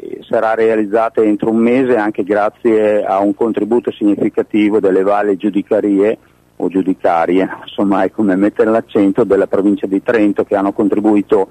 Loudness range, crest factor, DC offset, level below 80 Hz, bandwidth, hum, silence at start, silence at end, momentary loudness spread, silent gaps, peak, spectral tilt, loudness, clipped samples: 1 LU; 10 dB; under 0.1%; -54 dBFS; 9 kHz; none; 0 s; 0.05 s; 4 LU; none; -4 dBFS; -8 dB/octave; -14 LUFS; under 0.1%